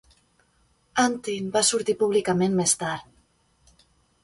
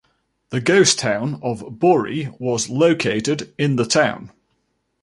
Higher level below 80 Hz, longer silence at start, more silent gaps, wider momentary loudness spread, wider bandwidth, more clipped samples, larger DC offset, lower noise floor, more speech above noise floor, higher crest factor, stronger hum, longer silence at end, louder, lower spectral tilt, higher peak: about the same, -62 dBFS vs -58 dBFS; first, 0.95 s vs 0.5 s; neither; second, 9 LU vs 12 LU; about the same, 11.5 kHz vs 11.5 kHz; neither; neither; second, -65 dBFS vs -69 dBFS; second, 42 dB vs 51 dB; about the same, 18 dB vs 18 dB; neither; first, 1.2 s vs 0.75 s; second, -23 LUFS vs -19 LUFS; about the same, -3.5 dB/octave vs -4 dB/octave; second, -8 dBFS vs -2 dBFS